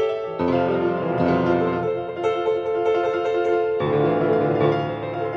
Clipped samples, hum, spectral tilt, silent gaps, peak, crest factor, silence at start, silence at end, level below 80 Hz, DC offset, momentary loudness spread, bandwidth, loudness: under 0.1%; none; -8.5 dB/octave; none; -8 dBFS; 14 dB; 0 s; 0 s; -54 dBFS; under 0.1%; 5 LU; 7 kHz; -22 LUFS